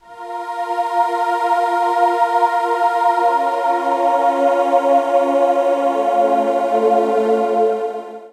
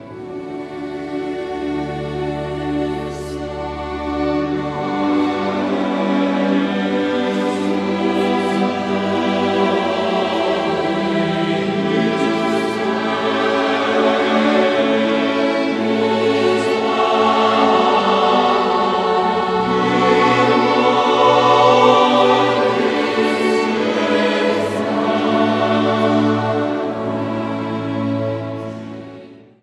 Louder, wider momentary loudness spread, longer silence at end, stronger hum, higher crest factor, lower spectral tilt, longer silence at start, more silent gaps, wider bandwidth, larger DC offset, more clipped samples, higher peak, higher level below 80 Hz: about the same, -16 LUFS vs -17 LUFS; second, 6 LU vs 11 LU; second, 0.05 s vs 0.25 s; neither; about the same, 12 dB vs 16 dB; about the same, -4.5 dB/octave vs -5.5 dB/octave; about the same, 0.1 s vs 0 s; neither; about the same, 12.5 kHz vs 12 kHz; neither; neither; second, -4 dBFS vs 0 dBFS; second, -82 dBFS vs -46 dBFS